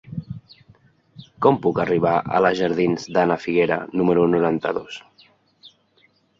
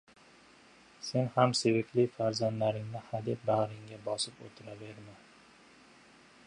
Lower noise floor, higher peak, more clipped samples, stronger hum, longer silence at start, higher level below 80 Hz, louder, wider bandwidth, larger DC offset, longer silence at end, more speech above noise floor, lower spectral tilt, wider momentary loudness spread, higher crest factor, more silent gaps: about the same, -61 dBFS vs -59 dBFS; first, -2 dBFS vs -12 dBFS; neither; neither; second, 0.1 s vs 1 s; first, -56 dBFS vs -72 dBFS; first, -20 LUFS vs -32 LUFS; second, 7.6 kHz vs 11 kHz; neither; second, 0.7 s vs 1.3 s; first, 41 dB vs 27 dB; first, -7 dB/octave vs -5.5 dB/octave; second, 16 LU vs 20 LU; about the same, 20 dB vs 22 dB; neither